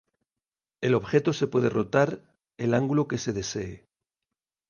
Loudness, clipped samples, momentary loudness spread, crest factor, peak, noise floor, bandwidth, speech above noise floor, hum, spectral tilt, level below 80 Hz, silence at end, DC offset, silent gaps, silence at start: -26 LUFS; under 0.1%; 9 LU; 18 dB; -10 dBFS; under -90 dBFS; 10 kHz; over 65 dB; none; -6 dB/octave; -58 dBFS; 0.9 s; under 0.1%; none; 0.8 s